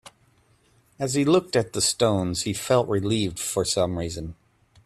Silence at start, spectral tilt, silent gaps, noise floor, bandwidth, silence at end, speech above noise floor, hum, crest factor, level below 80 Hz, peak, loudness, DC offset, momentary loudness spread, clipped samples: 1 s; -4.5 dB/octave; none; -62 dBFS; 15 kHz; 0.55 s; 38 dB; none; 18 dB; -52 dBFS; -8 dBFS; -24 LUFS; under 0.1%; 10 LU; under 0.1%